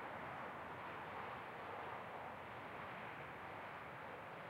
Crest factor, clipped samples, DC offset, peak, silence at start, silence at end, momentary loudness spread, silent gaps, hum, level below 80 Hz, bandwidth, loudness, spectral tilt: 16 dB; under 0.1%; under 0.1%; -36 dBFS; 0 s; 0 s; 2 LU; none; none; -78 dBFS; 16 kHz; -50 LUFS; -5.5 dB/octave